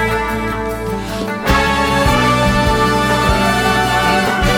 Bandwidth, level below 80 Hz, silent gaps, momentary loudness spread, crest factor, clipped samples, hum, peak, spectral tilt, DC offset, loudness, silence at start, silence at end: 19.5 kHz; -24 dBFS; none; 8 LU; 14 dB; under 0.1%; none; 0 dBFS; -4.5 dB/octave; under 0.1%; -14 LUFS; 0 s; 0 s